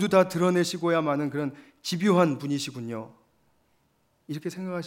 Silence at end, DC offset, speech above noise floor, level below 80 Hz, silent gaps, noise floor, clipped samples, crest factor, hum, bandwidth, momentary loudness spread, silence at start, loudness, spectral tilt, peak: 0 s; under 0.1%; 43 dB; -74 dBFS; none; -69 dBFS; under 0.1%; 20 dB; none; 16 kHz; 15 LU; 0 s; -26 LUFS; -5.5 dB/octave; -6 dBFS